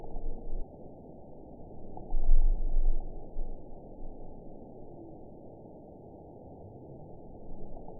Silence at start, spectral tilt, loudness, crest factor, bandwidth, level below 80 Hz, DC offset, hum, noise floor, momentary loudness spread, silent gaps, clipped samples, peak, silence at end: 0 s; -14.5 dB/octave; -42 LUFS; 20 dB; 1 kHz; -32 dBFS; under 0.1%; none; -49 dBFS; 16 LU; none; under 0.1%; -10 dBFS; 0 s